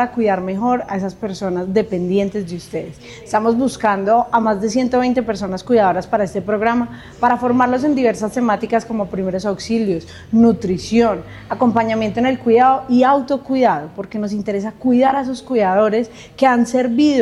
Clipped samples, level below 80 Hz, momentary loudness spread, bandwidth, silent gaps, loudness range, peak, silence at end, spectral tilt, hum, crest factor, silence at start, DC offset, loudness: under 0.1%; -48 dBFS; 10 LU; 12 kHz; none; 3 LU; -2 dBFS; 0 s; -6 dB/octave; none; 14 dB; 0 s; under 0.1%; -17 LUFS